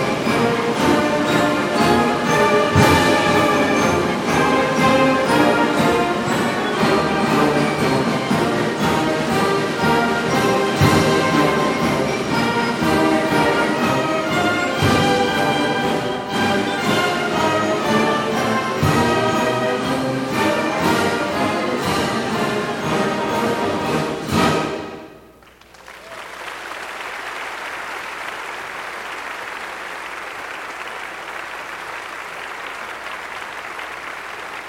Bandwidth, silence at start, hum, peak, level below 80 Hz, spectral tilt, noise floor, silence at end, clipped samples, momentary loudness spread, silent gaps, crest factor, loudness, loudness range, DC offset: 16.5 kHz; 0 s; none; 0 dBFS; -46 dBFS; -5 dB/octave; -46 dBFS; 0 s; under 0.1%; 13 LU; none; 18 dB; -18 LUFS; 13 LU; under 0.1%